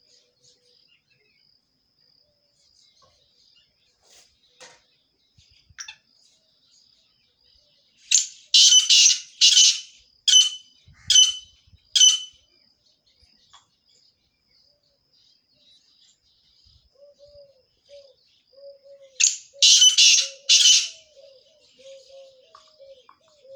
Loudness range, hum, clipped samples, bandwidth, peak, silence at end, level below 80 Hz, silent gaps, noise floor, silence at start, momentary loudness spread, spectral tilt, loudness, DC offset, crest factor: 8 LU; none; under 0.1%; over 20 kHz; -2 dBFS; 2.65 s; -72 dBFS; none; -67 dBFS; 5.8 s; 23 LU; 5.5 dB/octave; -15 LUFS; under 0.1%; 22 dB